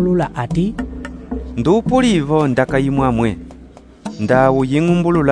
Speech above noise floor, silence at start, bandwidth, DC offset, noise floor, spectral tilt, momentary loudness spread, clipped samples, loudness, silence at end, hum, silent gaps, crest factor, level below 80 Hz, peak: 26 dB; 0 s; 10.5 kHz; under 0.1%; -40 dBFS; -7 dB/octave; 14 LU; under 0.1%; -16 LUFS; 0 s; none; none; 16 dB; -34 dBFS; 0 dBFS